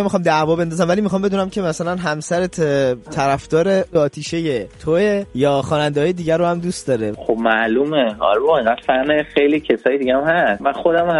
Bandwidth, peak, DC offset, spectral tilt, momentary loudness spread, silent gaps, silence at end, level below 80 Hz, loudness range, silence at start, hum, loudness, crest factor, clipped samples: 11.5 kHz; -2 dBFS; under 0.1%; -5.5 dB/octave; 5 LU; none; 0 s; -46 dBFS; 2 LU; 0 s; none; -18 LUFS; 16 dB; under 0.1%